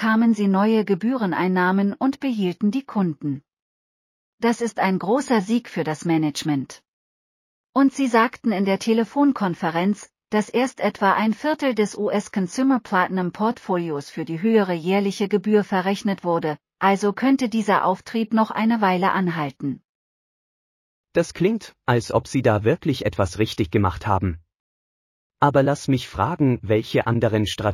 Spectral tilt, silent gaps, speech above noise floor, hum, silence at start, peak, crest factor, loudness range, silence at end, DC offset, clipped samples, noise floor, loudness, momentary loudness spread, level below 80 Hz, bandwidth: -6.5 dB/octave; 3.62-4.38 s, 6.88-7.73 s, 19.89-21.04 s, 24.60-25.30 s; over 69 dB; none; 0 s; -4 dBFS; 18 dB; 3 LU; 0 s; under 0.1%; under 0.1%; under -90 dBFS; -22 LUFS; 6 LU; -52 dBFS; 15 kHz